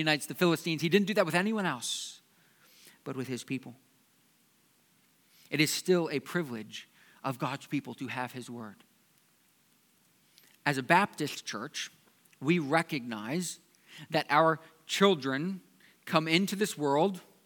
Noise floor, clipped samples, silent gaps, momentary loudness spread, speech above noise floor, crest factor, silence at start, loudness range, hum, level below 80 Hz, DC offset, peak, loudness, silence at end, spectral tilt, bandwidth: -68 dBFS; under 0.1%; none; 16 LU; 37 dB; 26 dB; 0 s; 10 LU; none; -86 dBFS; under 0.1%; -6 dBFS; -30 LUFS; 0.25 s; -4.5 dB/octave; 19 kHz